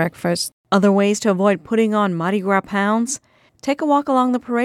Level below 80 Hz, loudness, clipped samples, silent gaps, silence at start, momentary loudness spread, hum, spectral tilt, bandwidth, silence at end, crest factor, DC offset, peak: -62 dBFS; -18 LUFS; under 0.1%; 0.53-0.64 s; 0 s; 7 LU; none; -5 dB/octave; 14.5 kHz; 0 s; 16 dB; under 0.1%; -2 dBFS